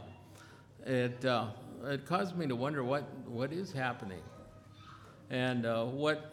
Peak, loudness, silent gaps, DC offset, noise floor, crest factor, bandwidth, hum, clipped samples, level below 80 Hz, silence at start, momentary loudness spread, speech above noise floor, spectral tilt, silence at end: -18 dBFS; -36 LUFS; none; under 0.1%; -56 dBFS; 18 dB; 15 kHz; none; under 0.1%; -70 dBFS; 0 s; 21 LU; 21 dB; -6.5 dB/octave; 0 s